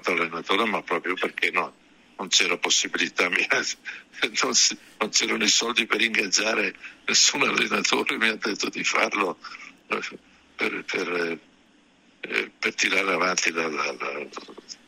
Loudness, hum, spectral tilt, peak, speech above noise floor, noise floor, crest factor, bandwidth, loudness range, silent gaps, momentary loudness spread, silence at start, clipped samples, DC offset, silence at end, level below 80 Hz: -23 LUFS; none; -0.5 dB/octave; -6 dBFS; 33 dB; -59 dBFS; 20 dB; 16 kHz; 7 LU; none; 14 LU; 0.05 s; under 0.1%; under 0.1%; 0.15 s; -72 dBFS